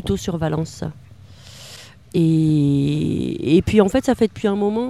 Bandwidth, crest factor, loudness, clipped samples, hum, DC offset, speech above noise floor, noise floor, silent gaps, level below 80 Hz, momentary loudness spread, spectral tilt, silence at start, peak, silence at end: 14 kHz; 18 dB; -19 LUFS; under 0.1%; none; 0.2%; 25 dB; -43 dBFS; none; -42 dBFS; 21 LU; -7 dB/octave; 0 s; 0 dBFS; 0 s